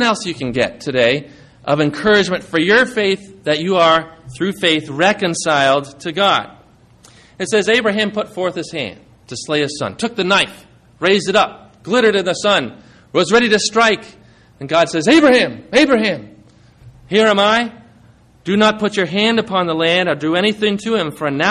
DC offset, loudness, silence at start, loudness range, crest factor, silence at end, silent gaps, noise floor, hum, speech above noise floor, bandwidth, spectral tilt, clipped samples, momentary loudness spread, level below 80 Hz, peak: under 0.1%; -15 LUFS; 0 s; 4 LU; 14 dB; 0 s; none; -48 dBFS; none; 32 dB; 13 kHz; -4 dB/octave; under 0.1%; 10 LU; -52 dBFS; -2 dBFS